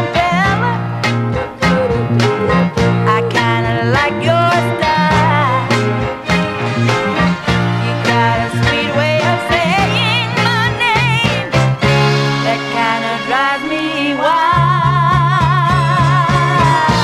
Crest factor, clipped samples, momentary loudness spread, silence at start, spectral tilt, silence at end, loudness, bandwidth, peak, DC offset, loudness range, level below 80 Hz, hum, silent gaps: 14 dB; under 0.1%; 4 LU; 0 s; -6 dB/octave; 0 s; -13 LUFS; 13 kHz; 0 dBFS; under 0.1%; 2 LU; -34 dBFS; none; none